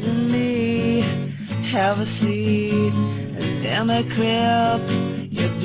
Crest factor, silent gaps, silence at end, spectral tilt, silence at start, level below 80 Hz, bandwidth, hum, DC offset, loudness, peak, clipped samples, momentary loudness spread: 12 dB; none; 0 s; -11 dB/octave; 0 s; -48 dBFS; 4 kHz; none; under 0.1%; -21 LUFS; -8 dBFS; under 0.1%; 7 LU